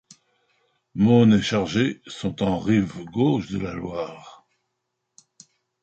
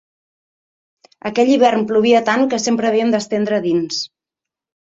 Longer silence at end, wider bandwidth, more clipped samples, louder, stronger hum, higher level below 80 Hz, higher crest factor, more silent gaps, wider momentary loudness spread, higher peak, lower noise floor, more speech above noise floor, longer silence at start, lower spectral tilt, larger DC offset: first, 1.5 s vs 0.8 s; about the same, 8.2 kHz vs 8 kHz; neither; second, -22 LUFS vs -16 LUFS; neither; first, -52 dBFS vs -62 dBFS; about the same, 18 dB vs 16 dB; neither; first, 15 LU vs 10 LU; second, -6 dBFS vs -2 dBFS; second, -78 dBFS vs -86 dBFS; second, 57 dB vs 71 dB; second, 0.95 s vs 1.25 s; first, -7 dB/octave vs -4.5 dB/octave; neither